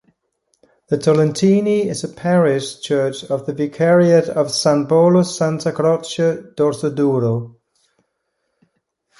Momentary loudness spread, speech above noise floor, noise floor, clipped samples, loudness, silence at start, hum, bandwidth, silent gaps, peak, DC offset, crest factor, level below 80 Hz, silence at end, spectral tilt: 10 LU; 56 dB; -72 dBFS; under 0.1%; -17 LUFS; 0.9 s; none; 11.5 kHz; none; -2 dBFS; under 0.1%; 16 dB; -60 dBFS; 1.7 s; -6 dB/octave